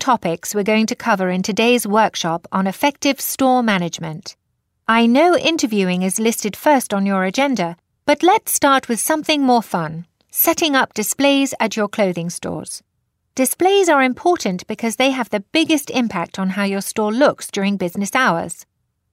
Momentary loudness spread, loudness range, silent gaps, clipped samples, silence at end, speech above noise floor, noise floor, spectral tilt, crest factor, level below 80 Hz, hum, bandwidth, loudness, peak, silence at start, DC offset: 10 LU; 2 LU; none; under 0.1%; 0.5 s; 36 dB; -54 dBFS; -4 dB/octave; 14 dB; -62 dBFS; none; 16 kHz; -17 LUFS; -2 dBFS; 0 s; under 0.1%